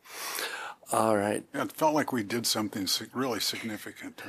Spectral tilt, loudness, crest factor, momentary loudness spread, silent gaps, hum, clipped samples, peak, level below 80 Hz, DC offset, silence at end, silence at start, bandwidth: -3 dB/octave; -30 LUFS; 20 dB; 10 LU; none; none; under 0.1%; -10 dBFS; -74 dBFS; under 0.1%; 0 s; 0.05 s; 15.5 kHz